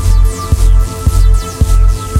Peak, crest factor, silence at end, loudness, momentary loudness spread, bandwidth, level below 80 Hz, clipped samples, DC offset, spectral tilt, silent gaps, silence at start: 0 dBFS; 8 dB; 0 s; -13 LUFS; 2 LU; 14.5 kHz; -10 dBFS; under 0.1%; under 0.1%; -5.5 dB/octave; none; 0 s